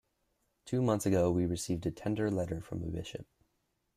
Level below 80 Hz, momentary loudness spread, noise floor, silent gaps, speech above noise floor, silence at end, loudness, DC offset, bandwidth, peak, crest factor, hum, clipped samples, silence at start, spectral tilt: -58 dBFS; 11 LU; -79 dBFS; none; 47 dB; 0.75 s; -33 LUFS; under 0.1%; 15 kHz; -18 dBFS; 18 dB; none; under 0.1%; 0.65 s; -6.5 dB/octave